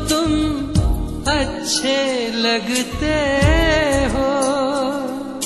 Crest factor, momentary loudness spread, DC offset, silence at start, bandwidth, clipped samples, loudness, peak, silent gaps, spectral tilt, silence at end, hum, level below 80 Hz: 14 dB; 6 LU; under 0.1%; 0 s; 12.5 kHz; under 0.1%; -18 LUFS; -4 dBFS; none; -4.5 dB/octave; 0 s; none; -26 dBFS